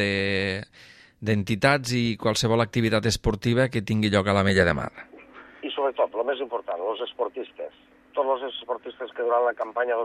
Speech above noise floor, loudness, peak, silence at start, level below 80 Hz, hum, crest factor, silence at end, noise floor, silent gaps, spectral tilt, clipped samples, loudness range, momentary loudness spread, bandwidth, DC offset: 23 dB; -25 LUFS; -6 dBFS; 0 s; -48 dBFS; none; 20 dB; 0 s; -47 dBFS; none; -5.5 dB/octave; under 0.1%; 7 LU; 14 LU; 14.5 kHz; under 0.1%